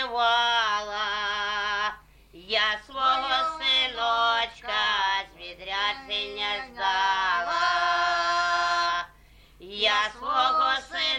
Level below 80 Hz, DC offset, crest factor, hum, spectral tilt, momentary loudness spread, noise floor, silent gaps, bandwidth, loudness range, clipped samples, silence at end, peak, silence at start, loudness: -56 dBFS; under 0.1%; 16 dB; none; -0.5 dB/octave; 7 LU; -54 dBFS; none; 11 kHz; 2 LU; under 0.1%; 0 s; -10 dBFS; 0 s; -25 LUFS